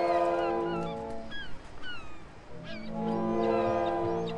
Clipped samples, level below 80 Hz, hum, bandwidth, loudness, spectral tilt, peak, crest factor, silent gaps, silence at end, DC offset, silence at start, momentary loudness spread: under 0.1%; -54 dBFS; none; 10.5 kHz; -31 LUFS; -7 dB/octave; -14 dBFS; 16 dB; none; 0 s; under 0.1%; 0 s; 17 LU